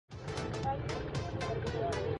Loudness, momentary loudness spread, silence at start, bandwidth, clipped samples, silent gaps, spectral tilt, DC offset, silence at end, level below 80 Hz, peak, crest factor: -37 LUFS; 4 LU; 0.1 s; 11.5 kHz; under 0.1%; none; -6 dB/octave; under 0.1%; 0 s; -48 dBFS; -24 dBFS; 12 dB